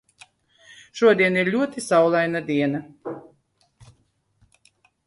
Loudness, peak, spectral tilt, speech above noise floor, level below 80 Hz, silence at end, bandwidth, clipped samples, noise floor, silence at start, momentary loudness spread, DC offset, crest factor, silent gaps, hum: -20 LUFS; -4 dBFS; -5.5 dB/octave; 45 dB; -66 dBFS; 1.85 s; 11.5 kHz; under 0.1%; -65 dBFS; 0.95 s; 19 LU; under 0.1%; 20 dB; none; none